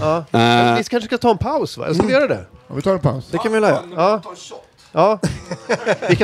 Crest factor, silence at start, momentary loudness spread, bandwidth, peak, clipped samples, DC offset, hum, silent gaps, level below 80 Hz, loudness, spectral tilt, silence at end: 18 dB; 0 s; 10 LU; 15 kHz; 0 dBFS; under 0.1%; under 0.1%; none; none; -46 dBFS; -18 LUFS; -6 dB/octave; 0 s